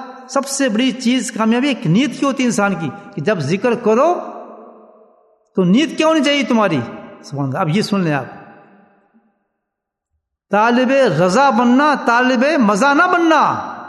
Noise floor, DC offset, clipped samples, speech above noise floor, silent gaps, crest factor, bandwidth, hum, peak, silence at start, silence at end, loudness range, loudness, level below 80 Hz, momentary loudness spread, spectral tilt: -79 dBFS; under 0.1%; under 0.1%; 64 dB; none; 16 dB; 12.5 kHz; none; 0 dBFS; 0 s; 0 s; 8 LU; -15 LUFS; -64 dBFS; 10 LU; -5 dB/octave